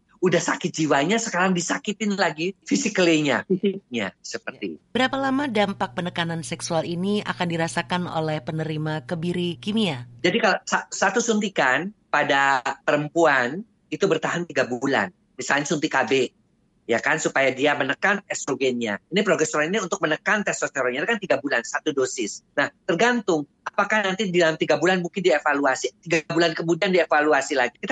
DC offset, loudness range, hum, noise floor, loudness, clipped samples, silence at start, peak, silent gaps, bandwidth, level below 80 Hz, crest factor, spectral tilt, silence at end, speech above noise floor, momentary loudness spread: under 0.1%; 4 LU; none; -52 dBFS; -23 LUFS; under 0.1%; 0.2 s; -6 dBFS; none; 11.5 kHz; -66 dBFS; 16 dB; -4 dB/octave; 0 s; 29 dB; 8 LU